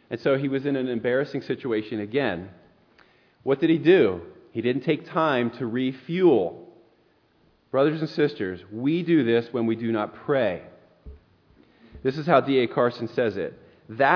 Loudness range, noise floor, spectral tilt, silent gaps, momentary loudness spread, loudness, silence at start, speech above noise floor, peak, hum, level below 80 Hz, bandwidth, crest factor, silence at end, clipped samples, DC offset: 3 LU; -63 dBFS; -8.5 dB/octave; none; 12 LU; -24 LUFS; 0.1 s; 39 dB; -4 dBFS; none; -60 dBFS; 5.4 kHz; 20 dB; 0 s; under 0.1%; under 0.1%